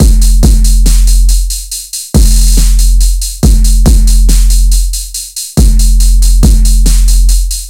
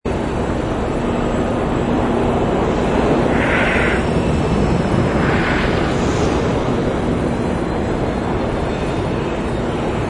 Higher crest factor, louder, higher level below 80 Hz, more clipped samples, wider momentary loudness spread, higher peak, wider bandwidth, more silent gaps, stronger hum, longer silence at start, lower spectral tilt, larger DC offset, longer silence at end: second, 6 dB vs 14 dB; first, -9 LUFS vs -18 LUFS; first, -6 dBFS vs -28 dBFS; first, 3% vs under 0.1%; about the same, 7 LU vs 5 LU; first, 0 dBFS vs -4 dBFS; first, 16 kHz vs 10 kHz; neither; neither; about the same, 0 s vs 0.05 s; second, -4.5 dB/octave vs -6.5 dB/octave; neither; about the same, 0 s vs 0 s